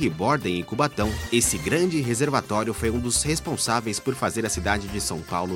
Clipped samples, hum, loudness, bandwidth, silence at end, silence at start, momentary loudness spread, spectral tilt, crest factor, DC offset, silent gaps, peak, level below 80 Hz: under 0.1%; none; -24 LUFS; 16.5 kHz; 0 s; 0 s; 6 LU; -4 dB/octave; 20 dB; under 0.1%; none; -6 dBFS; -40 dBFS